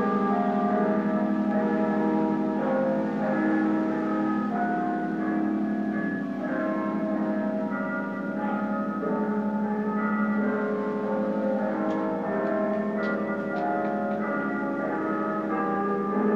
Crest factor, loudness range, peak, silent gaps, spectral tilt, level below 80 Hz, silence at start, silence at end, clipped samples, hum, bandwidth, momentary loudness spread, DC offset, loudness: 14 dB; 3 LU; -12 dBFS; none; -9 dB/octave; -66 dBFS; 0 s; 0 s; under 0.1%; none; 6.2 kHz; 4 LU; under 0.1%; -27 LUFS